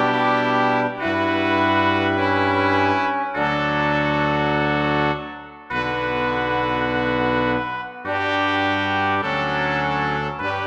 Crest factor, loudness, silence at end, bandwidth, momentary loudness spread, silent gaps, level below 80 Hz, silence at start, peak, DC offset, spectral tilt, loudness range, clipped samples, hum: 14 dB; -20 LUFS; 0 s; 8.8 kHz; 6 LU; none; -46 dBFS; 0 s; -6 dBFS; under 0.1%; -6.5 dB/octave; 3 LU; under 0.1%; none